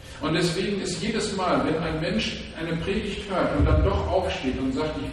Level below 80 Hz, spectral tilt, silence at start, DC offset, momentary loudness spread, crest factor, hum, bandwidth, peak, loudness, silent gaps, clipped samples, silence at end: -34 dBFS; -5.5 dB/octave; 0 s; under 0.1%; 6 LU; 16 dB; none; 12.5 kHz; -10 dBFS; -25 LUFS; none; under 0.1%; 0 s